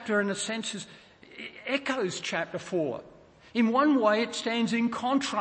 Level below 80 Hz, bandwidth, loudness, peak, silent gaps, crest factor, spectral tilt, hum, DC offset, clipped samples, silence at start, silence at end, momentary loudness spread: -70 dBFS; 8.8 kHz; -28 LUFS; -10 dBFS; none; 18 dB; -4 dB/octave; none; under 0.1%; under 0.1%; 0 s; 0 s; 16 LU